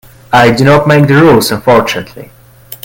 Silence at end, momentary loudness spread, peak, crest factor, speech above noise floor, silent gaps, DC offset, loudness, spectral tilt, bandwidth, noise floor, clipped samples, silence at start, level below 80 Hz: 0.1 s; 11 LU; 0 dBFS; 8 dB; 24 dB; none; under 0.1%; -7 LUFS; -6 dB/octave; 17.5 kHz; -31 dBFS; 1%; 0.3 s; -40 dBFS